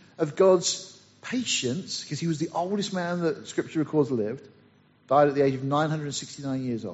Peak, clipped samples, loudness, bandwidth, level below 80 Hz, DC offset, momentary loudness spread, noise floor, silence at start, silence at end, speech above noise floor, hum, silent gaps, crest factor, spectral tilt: -8 dBFS; under 0.1%; -26 LUFS; 8 kHz; -68 dBFS; under 0.1%; 12 LU; -59 dBFS; 0.2 s; 0 s; 33 dB; none; none; 18 dB; -5 dB/octave